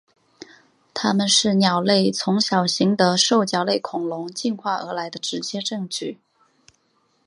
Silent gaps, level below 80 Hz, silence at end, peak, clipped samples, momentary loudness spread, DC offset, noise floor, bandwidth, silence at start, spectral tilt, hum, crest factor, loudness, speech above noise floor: none; -68 dBFS; 1.1 s; -2 dBFS; under 0.1%; 11 LU; under 0.1%; -66 dBFS; 11.5 kHz; 0.95 s; -4 dB/octave; none; 20 dB; -20 LUFS; 45 dB